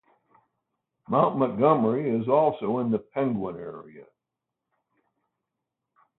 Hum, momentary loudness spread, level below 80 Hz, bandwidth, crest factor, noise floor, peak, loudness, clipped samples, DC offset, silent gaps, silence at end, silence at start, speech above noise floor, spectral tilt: none; 14 LU; -68 dBFS; 4.1 kHz; 20 dB; -86 dBFS; -6 dBFS; -25 LUFS; under 0.1%; under 0.1%; none; 2.15 s; 1.1 s; 61 dB; -12 dB/octave